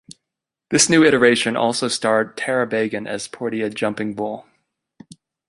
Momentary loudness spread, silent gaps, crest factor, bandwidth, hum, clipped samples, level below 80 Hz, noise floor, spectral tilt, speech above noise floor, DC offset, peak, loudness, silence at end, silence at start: 14 LU; none; 20 dB; 11.5 kHz; none; under 0.1%; -60 dBFS; -84 dBFS; -3 dB/octave; 65 dB; under 0.1%; 0 dBFS; -19 LUFS; 1.05 s; 0.7 s